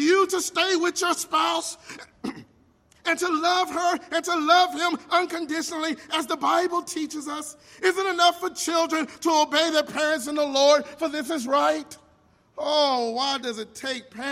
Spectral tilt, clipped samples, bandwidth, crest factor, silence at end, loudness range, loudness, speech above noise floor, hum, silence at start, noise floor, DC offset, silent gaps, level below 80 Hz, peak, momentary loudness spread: -1.5 dB/octave; under 0.1%; 16 kHz; 20 dB; 0 s; 4 LU; -24 LUFS; 36 dB; none; 0 s; -60 dBFS; under 0.1%; none; -70 dBFS; -6 dBFS; 12 LU